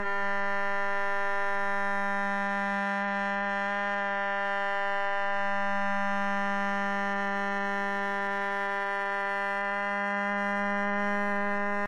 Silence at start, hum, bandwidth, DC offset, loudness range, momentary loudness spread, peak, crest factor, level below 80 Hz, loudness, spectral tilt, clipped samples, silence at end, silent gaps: 0 s; none; 12 kHz; under 0.1%; 0 LU; 1 LU; -18 dBFS; 12 dB; -68 dBFS; -29 LUFS; -5.5 dB/octave; under 0.1%; 0 s; none